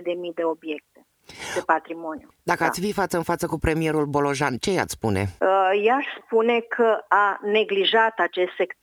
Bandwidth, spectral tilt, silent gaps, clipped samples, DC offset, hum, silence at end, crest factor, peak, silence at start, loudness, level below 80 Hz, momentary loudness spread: 18.5 kHz; -4.5 dB/octave; none; under 0.1%; under 0.1%; none; 0.1 s; 20 dB; -2 dBFS; 0 s; -22 LUFS; -48 dBFS; 11 LU